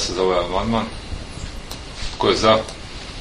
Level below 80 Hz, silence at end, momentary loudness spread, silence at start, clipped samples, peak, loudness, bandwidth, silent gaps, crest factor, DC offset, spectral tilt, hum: -34 dBFS; 0 s; 17 LU; 0 s; under 0.1%; 0 dBFS; -20 LUFS; 11.5 kHz; none; 22 dB; under 0.1%; -4.5 dB/octave; none